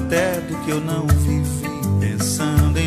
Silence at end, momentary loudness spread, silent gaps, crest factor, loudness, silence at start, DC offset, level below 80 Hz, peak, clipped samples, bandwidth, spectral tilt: 0 s; 6 LU; none; 16 dB; -20 LUFS; 0 s; under 0.1%; -28 dBFS; -4 dBFS; under 0.1%; 15.5 kHz; -5.5 dB/octave